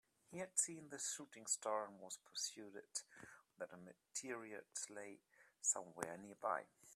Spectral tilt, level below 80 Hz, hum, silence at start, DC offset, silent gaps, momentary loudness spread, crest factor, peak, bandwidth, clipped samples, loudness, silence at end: -1 dB/octave; under -90 dBFS; none; 0.3 s; under 0.1%; none; 17 LU; 26 dB; -22 dBFS; 15.5 kHz; under 0.1%; -46 LUFS; 0 s